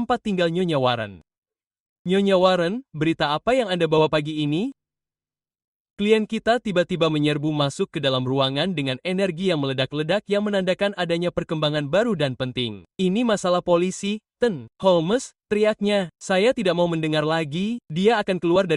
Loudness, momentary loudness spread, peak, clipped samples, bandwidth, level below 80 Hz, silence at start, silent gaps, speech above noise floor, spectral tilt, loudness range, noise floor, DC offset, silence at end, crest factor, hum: -22 LUFS; 6 LU; -4 dBFS; under 0.1%; 11.5 kHz; -56 dBFS; 0 s; 1.38-1.42 s, 1.80-2.05 s, 5.64-5.94 s; over 68 dB; -5.5 dB/octave; 2 LU; under -90 dBFS; under 0.1%; 0 s; 18 dB; none